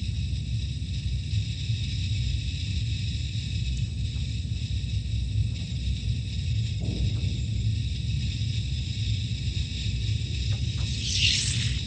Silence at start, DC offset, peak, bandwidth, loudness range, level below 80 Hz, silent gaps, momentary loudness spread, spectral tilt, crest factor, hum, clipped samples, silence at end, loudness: 0 s; under 0.1%; -8 dBFS; 9.4 kHz; 3 LU; -34 dBFS; none; 4 LU; -4 dB/octave; 20 dB; none; under 0.1%; 0 s; -29 LUFS